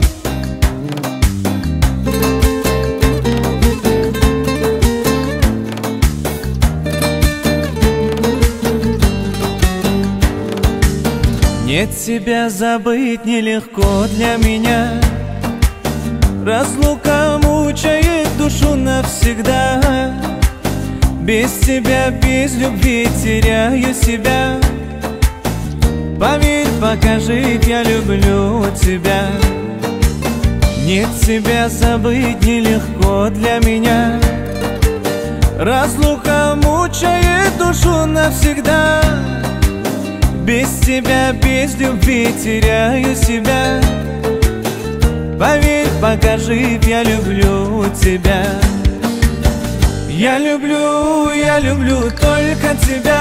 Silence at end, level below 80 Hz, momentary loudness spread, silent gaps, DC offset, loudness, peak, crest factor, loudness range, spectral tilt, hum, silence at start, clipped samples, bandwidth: 0 s; -18 dBFS; 4 LU; none; under 0.1%; -14 LUFS; 0 dBFS; 14 dB; 2 LU; -5.5 dB/octave; none; 0 s; under 0.1%; 16.5 kHz